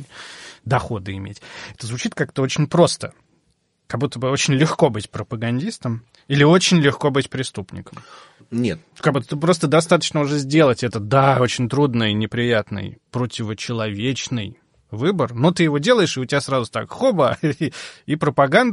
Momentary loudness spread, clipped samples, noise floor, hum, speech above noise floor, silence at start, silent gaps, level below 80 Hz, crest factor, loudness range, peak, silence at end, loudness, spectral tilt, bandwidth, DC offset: 15 LU; under 0.1%; -66 dBFS; none; 47 dB; 0 s; none; -54 dBFS; 18 dB; 5 LU; -2 dBFS; 0 s; -19 LUFS; -5.5 dB/octave; 11.5 kHz; under 0.1%